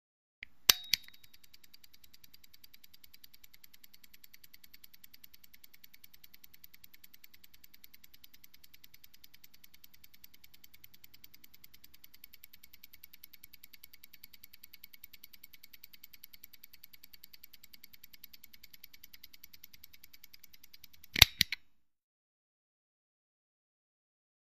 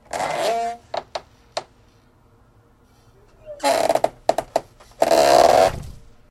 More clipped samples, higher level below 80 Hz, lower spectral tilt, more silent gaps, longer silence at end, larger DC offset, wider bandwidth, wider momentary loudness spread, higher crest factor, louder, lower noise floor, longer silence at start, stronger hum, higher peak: neither; second, -56 dBFS vs -48 dBFS; second, 0 dB/octave vs -3 dB/octave; neither; first, 3 s vs 0.35 s; first, 0.2% vs under 0.1%; about the same, 15.5 kHz vs 16 kHz; first, 24 LU vs 21 LU; first, 42 dB vs 20 dB; second, -27 LUFS vs -19 LUFS; first, -64 dBFS vs -55 dBFS; first, 0.7 s vs 0.15 s; neither; about the same, 0 dBFS vs -2 dBFS